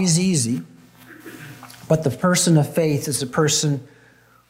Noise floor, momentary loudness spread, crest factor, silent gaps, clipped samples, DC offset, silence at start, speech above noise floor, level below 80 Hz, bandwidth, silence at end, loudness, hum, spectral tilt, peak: -53 dBFS; 22 LU; 16 dB; none; under 0.1%; under 0.1%; 0 s; 34 dB; -60 dBFS; 16 kHz; 0.65 s; -20 LUFS; none; -4.5 dB/octave; -6 dBFS